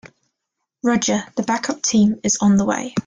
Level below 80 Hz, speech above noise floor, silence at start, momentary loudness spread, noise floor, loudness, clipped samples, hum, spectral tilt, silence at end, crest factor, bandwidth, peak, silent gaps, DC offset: -54 dBFS; 61 dB; 0.05 s; 6 LU; -79 dBFS; -18 LUFS; under 0.1%; none; -4 dB/octave; 0.05 s; 14 dB; 9.6 kHz; -6 dBFS; none; under 0.1%